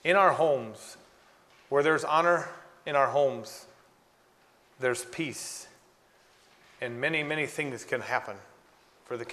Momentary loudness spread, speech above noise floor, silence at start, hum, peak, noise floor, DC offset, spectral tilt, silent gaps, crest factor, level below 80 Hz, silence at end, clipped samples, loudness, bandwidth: 18 LU; 35 dB; 0.05 s; none; -8 dBFS; -63 dBFS; under 0.1%; -4 dB/octave; none; 22 dB; -74 dBFS; 0 s; under 0.1%; -28 LUFS; 13.5 kHz